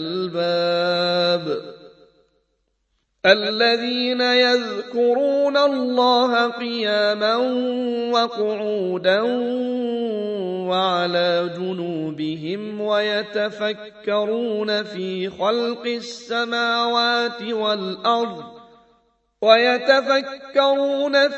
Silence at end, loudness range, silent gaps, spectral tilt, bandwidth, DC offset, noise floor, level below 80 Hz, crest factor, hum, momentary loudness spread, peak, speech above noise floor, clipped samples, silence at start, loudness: 0 s; 5 LU; none; -4.5 dB/octave; 8.2 kHz; under 0.1%; -70 dBFS; -70 dBFS; 20 dB; none; 10 LU; 0 dBFS; 50 dB; under 0.1%; 0 s; -20 LUFS